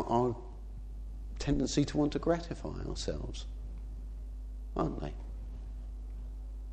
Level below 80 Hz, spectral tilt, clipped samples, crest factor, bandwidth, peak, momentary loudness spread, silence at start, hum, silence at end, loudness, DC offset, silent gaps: -42 dBFS; -6 dB/octave; under 0.1%; 20 dB; 9.2 kHz; -16 dBFS; 15 LU; 0 s; none; 0 s; -37 LUFS; under 0.1%; none